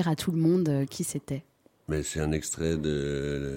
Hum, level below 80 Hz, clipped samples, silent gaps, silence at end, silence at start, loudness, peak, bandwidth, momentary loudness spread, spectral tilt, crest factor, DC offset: none; -46 dBFS; under 0.1%; none; 0 s; 0 s; -29 LUFS; -14 dBFS; 16.5 kHz; 10 LU; -5.5 dB/octave; 16 dB; under 0.1%